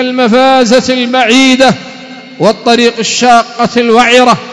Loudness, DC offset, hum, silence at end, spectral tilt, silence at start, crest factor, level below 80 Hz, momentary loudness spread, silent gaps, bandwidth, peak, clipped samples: -7 LUFS; under 0.1%; none; 0 s; -3.5 dB/octave; 0 s; 8 dB; -44 dBFS; 7 LU; none; 11 kHz; 0 dBFS; 6%